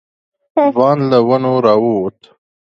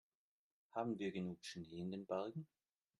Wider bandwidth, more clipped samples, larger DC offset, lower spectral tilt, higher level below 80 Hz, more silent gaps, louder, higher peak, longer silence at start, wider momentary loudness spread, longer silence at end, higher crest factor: second, 6.8 kHz vs 11.5 kHz; neither; neither; first, -9 dB/octave vs -6.5 dB/octave; first, -58 dBFS vs -82 dBFS; neither; first, -13 LUFS vs -47 LUFS; first, 0 dBFS vs -28 dBFS; second, 0.55 s vs 0.75 s; about the same, 8 LU vs 8 LU; first, 0.7 s vs 0.55 s; second, 14 dB vs 20 dB